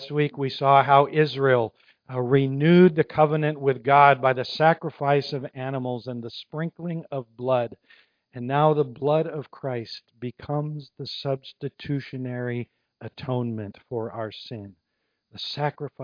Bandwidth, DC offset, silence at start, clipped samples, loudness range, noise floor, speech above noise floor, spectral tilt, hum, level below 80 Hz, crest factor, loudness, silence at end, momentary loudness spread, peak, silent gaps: 5.2 kHz; under 0.1%; 0 s; under 0.1%; 12 LU; -76 dBFS; 53 dB; -8.5 dB/octave; none; -66 dBFS; 22 dB; -23 LUFS; 0 s; 18 LU; -2 dBFS; none